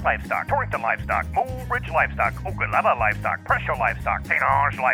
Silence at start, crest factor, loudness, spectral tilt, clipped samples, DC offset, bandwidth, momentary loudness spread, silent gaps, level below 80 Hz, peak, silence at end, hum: 0 s; 16 dB; -22 LUFS; -6.5 dB/octave; under 0.1%; under 0.1%; over 20 kHz; 6 LU; none; -38 dBFS; -6 dBFS; 0 s; none